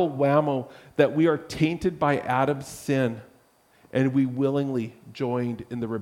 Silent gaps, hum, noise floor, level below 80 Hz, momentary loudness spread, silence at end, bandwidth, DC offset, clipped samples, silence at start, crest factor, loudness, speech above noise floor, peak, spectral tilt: none; none; -60 dBFS; -58 dBFS; 10 LU; 0 s; 15.5 kHz; under 0.1%; under 0.1%; 0 s; 20 dB; -25 LUFS; 35 dB; -6 dBFS; -7 dB/octave